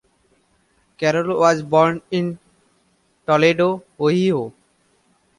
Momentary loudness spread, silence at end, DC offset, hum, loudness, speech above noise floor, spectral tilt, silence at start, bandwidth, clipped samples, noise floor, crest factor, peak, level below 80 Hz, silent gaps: 11 LU; 0.9 s; under 0.1%; none; -18 LUFS; 45 dB; -6 dB/octave; 1 s; 11.5 kHz; under 0.1%; -62 dBFS; 18 dB; -2 dBFS; -60 dBFS; none